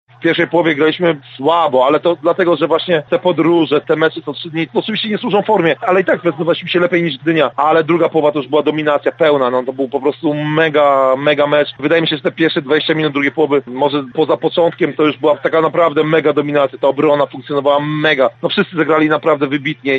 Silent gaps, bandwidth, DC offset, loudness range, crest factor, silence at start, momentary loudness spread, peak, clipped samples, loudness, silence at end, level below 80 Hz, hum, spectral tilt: none; 7.6 kHz; under 0.1%; 1 LU; 12 dB; 0.2 s; 5 LU; -2 dBFS; under 0.1%; -14 LUFS; 0 s; -66 dBFS; none; -7.5 dB/octave